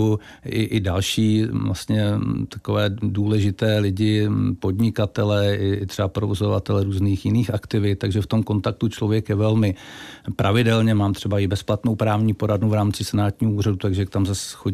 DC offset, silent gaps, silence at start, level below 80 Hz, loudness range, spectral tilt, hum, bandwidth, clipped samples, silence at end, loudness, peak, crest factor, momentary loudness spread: 0.1%; none; 0 s; -48 dBFS; 1 LU; -6.5 dB/octave; none; 14 kHz; under 0.1%; 0 s; -21 LUFS; -6 dBFS; 14 dB; 5 LU